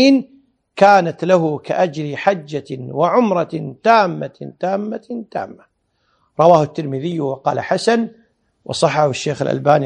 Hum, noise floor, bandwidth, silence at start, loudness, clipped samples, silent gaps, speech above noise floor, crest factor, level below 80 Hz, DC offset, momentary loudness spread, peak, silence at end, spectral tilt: none; -65 dBFS; 10.5 kHz; 0 s; -17 LUFS; under 0.1%; none; 48 dB; 16 dB; -62 dBFS; under 0.1%; 15 LU; 0 dBFS; 0 s; -6 dB/octave